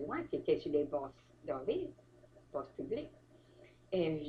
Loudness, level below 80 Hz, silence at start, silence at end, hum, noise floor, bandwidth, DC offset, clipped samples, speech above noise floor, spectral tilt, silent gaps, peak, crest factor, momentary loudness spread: -39 LUFS; -68 dBFS; 0 s; 0 s; none; -62 dBFS; 6.6 kHz; under 0.1%; under 0.1%; 24 dB; -8 dB/octave; none; -20 dBFS; 20 dB; 13 LU